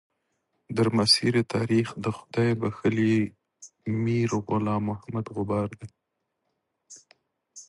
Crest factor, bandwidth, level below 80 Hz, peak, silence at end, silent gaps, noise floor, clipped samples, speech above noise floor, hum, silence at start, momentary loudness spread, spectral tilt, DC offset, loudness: 20 dB; 11.5 kHz; -58 dBFS; -6 dBFS; 0.05 s; none; -79 dBFS; under 0.1%; 54 dB; none; 0.7 s; 13 LU; -5.5 dB/octave; under 0.1%; -26 LUFS